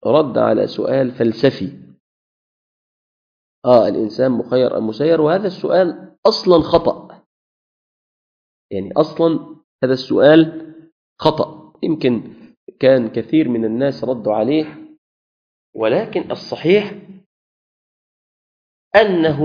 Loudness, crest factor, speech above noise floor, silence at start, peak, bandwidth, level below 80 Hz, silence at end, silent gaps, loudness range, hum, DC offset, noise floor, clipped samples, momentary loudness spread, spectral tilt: -16 LUFS; 18 dB; over 75 dB; 0.05 s; 0 dBFS; 5.2 kHz; -52 dBFS; 0 s; 2.00-3.62 s, 6.18-6.23 s, 7.26-8.69 s, 9.64-9.79 s, 10.92-11.16 s, 12.57-12.67 s, 14.98-15.73 s, 17.26-18.91 s; 6 LU; none; under 0.1%; under -90 dBFS; under 0.1%; 11 LU; -7.5 dB/octave